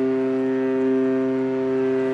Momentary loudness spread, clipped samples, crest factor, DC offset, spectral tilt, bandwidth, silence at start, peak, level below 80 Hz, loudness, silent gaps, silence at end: 2 LU; under 0.1%; 8 dB; under 0.1%; -8 dB/octave; 6.2 kHz; 0 s; -12 dBFS; -64 dBFS; -22 LUFS; none; 0 s